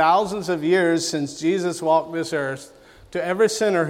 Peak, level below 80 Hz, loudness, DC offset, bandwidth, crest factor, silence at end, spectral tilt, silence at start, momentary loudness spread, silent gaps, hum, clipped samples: -6 dBFS; -60 dBFS; -22 LUFS; under 0.1%; 16 kHz; 16 dB; 0 s; -4.5 dB/octave; 0 s; 9 LU; none; none; under 0.1%